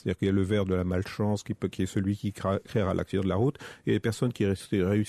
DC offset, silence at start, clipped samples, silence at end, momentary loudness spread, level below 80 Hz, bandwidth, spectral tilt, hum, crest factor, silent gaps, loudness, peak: under 0.1%; 0.05 s; under 0.1%; 0 s; 4 LU; -54 dBFS; 13.5 kHz; -7 dB/octave; none; 14 dB; none; -29 LUFS; -14 dBFS